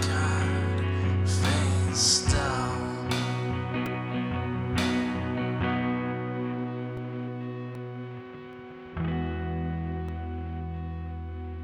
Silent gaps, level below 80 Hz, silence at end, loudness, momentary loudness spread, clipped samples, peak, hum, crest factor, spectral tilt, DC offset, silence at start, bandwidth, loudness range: none; -42 dBFS; 0 s; -29 LUFS; 13 LU; under 0.1%; -10 dBFS; none; 18 dB; -4.5 dB/octave; under 0.1%; 0 s; 13 kHz; 9 LU